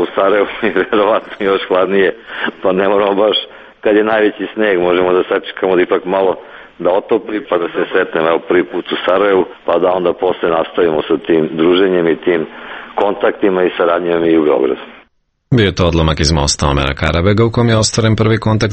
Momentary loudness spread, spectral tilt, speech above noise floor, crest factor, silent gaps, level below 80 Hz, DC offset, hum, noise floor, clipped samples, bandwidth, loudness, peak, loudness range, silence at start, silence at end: 6 LU; -5.5 dB/octave; 42 dB; 14 dB; none; -32 dBFS; under 0.1%; none; -55 dBFS; under 0.1%; 8.8 kHz; -14 LUFS; 0 dBFS; 2 LU; 0 s; 0 s